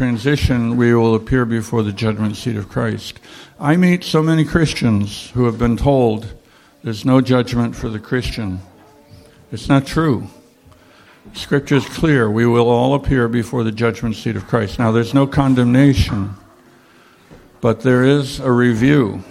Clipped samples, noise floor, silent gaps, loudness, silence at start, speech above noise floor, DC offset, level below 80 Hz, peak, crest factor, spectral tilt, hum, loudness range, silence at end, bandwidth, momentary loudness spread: under 0.1%; -48 dBFS; none; -16 LUFS; 0 s; 33 dB; under 0.1%; -34 dBFS; -2 dBFS; 14 dB; -7 dB/octave; none; 4 LU; 0.1 s; 15 kHz; 11 LU